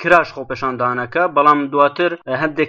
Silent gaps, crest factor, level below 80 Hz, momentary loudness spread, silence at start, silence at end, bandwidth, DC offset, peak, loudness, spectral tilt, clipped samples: none; 16 dB; -54 dBFS; 9 LU; 0 s; 0 s; 8.8 kHz; under 0.1%; 0 dBFS; -16 LUFS; -6.5 dB/octave; under 0.1%